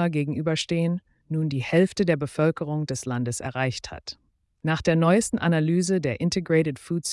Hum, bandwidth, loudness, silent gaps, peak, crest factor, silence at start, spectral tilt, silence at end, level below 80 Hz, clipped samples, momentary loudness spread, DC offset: none; 12 kHz; -25 LUFS; none; -10 dBFS; 16 dB; 0 s; -5.5 dB/octave; 0 s; -56 dBFS; under 0.1%; 11 LU; under 0.1%